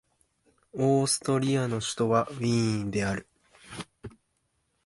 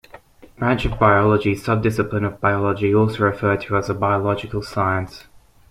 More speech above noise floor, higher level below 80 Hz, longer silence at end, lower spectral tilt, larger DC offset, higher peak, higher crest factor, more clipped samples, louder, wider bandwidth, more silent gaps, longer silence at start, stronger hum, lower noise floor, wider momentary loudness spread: first, 49 dB vs 26 dB; second, -58 dBFS vs -40 dBFS; first, 0.75 s vs 0.5 s; second, -5 dB/octave vs -7.5 dB/octave; neither; second, -10 dBFS vs -2 dBFS; about the same, 20 dB vs 18 dB; neither; second, -27 LUFS vs -19 LUFS; second, 11.5 kHz vs 13.5 kHz; neither; first, 0.75 s vs 0.6 s; neither; first, -75 dBFS vs -45 dBFS; first, 18 LU vs 7 LU